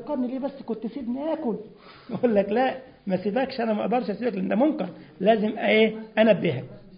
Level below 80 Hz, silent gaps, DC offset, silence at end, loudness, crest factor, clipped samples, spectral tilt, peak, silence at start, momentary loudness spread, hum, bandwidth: -62 dBFS; none; under 0.1%; 0 s; -25 LUFS; 18 dB; under 0.1%; -11 dB/octave; -6 dBFS; 0 s; 12 LU; none; 5.2 kHz